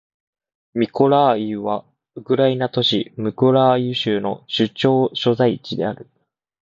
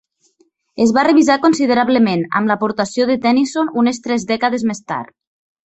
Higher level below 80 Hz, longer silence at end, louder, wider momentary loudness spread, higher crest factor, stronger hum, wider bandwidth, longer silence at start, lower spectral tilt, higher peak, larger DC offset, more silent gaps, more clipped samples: about the same, -60 dBFS vs -58 dBFS; about the same, 0.6 s vs 0.7 s; second, -19 LUFS vs -15 LUFS; about the same, 11 LU vs 10 LU; about the same, 18 dB vs 16 dB; neither; about the same, 7.6 kHz vs 8.2 kHz; about the same, 0.75 s vs 0.75 s; first, -7 dB/octave vs -5 dB/octave; about the same, -2 dBFS vs 0 dBFS; neither; neither; neither